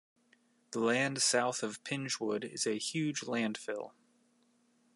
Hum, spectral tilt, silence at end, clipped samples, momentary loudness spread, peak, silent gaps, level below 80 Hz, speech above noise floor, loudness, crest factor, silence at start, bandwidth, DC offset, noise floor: none; -3 dB/octave; 1.05 s; under 0.1%; 12 LU; -16 dBFS; none; -86 dBFS; 37 dB; -34 LUFS; 20 dB; 0.7 s; 11.5 kHz; under 0.1%; -71 dBFS